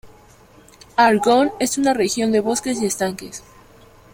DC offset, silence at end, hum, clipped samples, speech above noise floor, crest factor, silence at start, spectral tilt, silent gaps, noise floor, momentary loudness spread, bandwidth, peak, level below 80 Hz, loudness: under 0.1%; 0.75 s; none; under 0.1%; 30 dB; 18 dB; 0.05 s; -3.5 dB/octave; none; -48 dBFS; 12 LU; 16.5 kHz; -2 dBFS; -54 dBFS; -18 LUFS